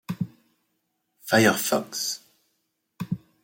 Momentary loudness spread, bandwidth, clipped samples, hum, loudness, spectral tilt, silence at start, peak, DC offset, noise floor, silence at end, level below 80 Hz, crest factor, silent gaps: 17 LU; 16.5 kHz; under 0.1%; none; -25 LUFS; -3.5 dB/octave; 0.1 s; -4 dBFS; under 0.1%; -76 dBFS; 0.25 s; -68 dBFS; 22 dB; none